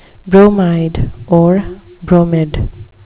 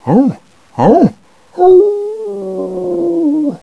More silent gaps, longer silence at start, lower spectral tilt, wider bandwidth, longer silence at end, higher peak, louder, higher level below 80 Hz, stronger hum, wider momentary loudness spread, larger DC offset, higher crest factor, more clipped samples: neither; first, 0.25 s vs 0.05 s; first, -12.5 dB/octave vs -9.5 dB/octave; second, 4 kHz vs 7.2 kHz; first, 0.2 s vs 0.05 s; about the same, 0 dBFS vs 0 dBFS; about the same, -12 LUFS vs -12 LUFS; first, -28 dBFS vs -48 dBFS; neither; about the same, 15 LU vs 14 LU; neither; about the same, 12 dB vs 12 dB; first, 0.9% vs under 0.1%